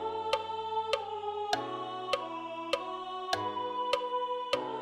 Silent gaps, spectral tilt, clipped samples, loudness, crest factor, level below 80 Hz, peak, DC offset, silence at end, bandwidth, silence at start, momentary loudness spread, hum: none; -3 dB/octave; under 0.1%; -34 LUFS; 20 dB; -70 dBFS; -14 dBFS; under 0.1%; 0 s; 15.5 kHz; 0 s; 6 LU; none